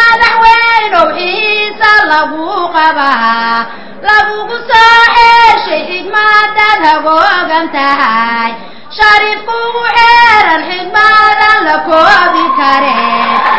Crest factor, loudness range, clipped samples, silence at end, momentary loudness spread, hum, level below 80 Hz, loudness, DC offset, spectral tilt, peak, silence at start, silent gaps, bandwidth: 8 dB; 3 LU; 3%; 0 s; 10 LU; none; -40 dBFS; -7 LUFS; 4%; -3 dB/octave; 0 dBFS; 0 s; none; 8 kHz